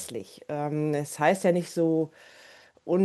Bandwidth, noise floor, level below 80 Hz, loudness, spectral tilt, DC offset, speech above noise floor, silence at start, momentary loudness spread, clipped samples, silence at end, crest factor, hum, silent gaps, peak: 13 kHz; -53 dBFS; -74 dBFS; -27 LUFS; -6 dB/octave; under 0.1%; 26 dB; 0 s; 13 LU; under 0.1%; 0 s; 18 dB; none; none; -10 dBFS